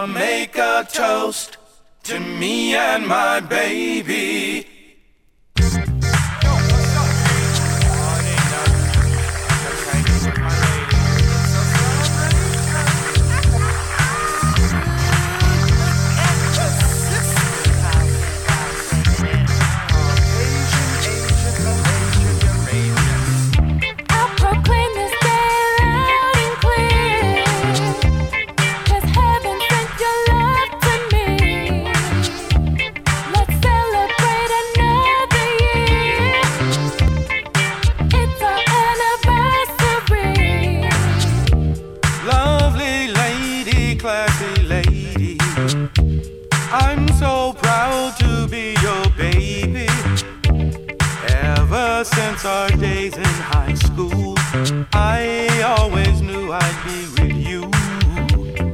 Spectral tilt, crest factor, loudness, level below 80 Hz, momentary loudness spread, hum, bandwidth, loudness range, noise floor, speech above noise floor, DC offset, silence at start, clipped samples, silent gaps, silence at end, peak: -4.5 dB/octave; 14 dB; -17 LUFS; -24 dBFS; 5 LU; none; 18.5 kHz; 3 LU; -53 dBFS; 34 dB; under 0.1%; 0 s; under 0.1%; none; 0 s; -2 dBFS